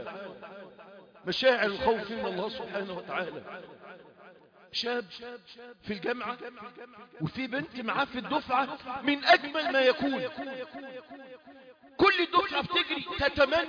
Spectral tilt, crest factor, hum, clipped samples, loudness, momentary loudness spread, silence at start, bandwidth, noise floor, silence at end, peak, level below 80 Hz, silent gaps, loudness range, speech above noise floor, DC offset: -5 dB/octave; 22 dB; none; under 0.1%; -29 LUFS; 22 LU; 0 s; 5.2 kHz; -55 dBFS; 0 s; -10 dBFS; -60 dBFS; none; 9 LU; 25 dB; under 0.1%